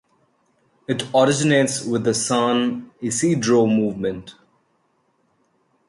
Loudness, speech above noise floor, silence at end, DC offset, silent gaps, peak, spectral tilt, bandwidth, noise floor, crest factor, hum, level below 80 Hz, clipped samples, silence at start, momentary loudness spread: -20 LUFS; 46 dB; 1.55 s; under 0.1%; none; -4 dBFS; -4.5 dB/octave; 11.5 kHz; -66 dBFS; 18 dB; none; -60 dBFS; under 0.1%; 0.9 s; 10 LU